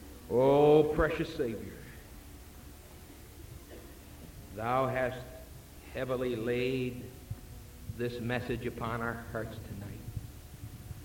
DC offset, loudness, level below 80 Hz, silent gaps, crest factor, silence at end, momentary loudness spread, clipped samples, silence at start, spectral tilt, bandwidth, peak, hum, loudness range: under 0.1%; -32 LUFS; -50 dBFS; none; 20 dB; 0 s; 24 LU; under 0.1%; 0 s; -6.5 dB/octave; 17 kHz; -12 dBFS; none; 9 LU